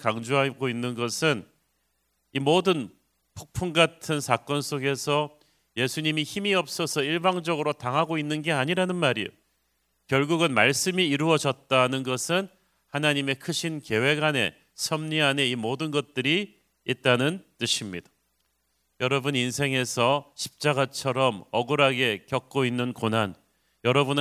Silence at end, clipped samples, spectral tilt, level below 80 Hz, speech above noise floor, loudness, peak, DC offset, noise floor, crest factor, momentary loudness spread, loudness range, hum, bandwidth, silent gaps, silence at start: 0 s; under 0.1%; -4 dB/octave; -62 dBFS; 48 dB; -25 LUFS; -4 dBFS; under 0.1%; -73 dBFS; 22 dB; 8 LU; 3 LU; none; 16 kHz; none; 0 s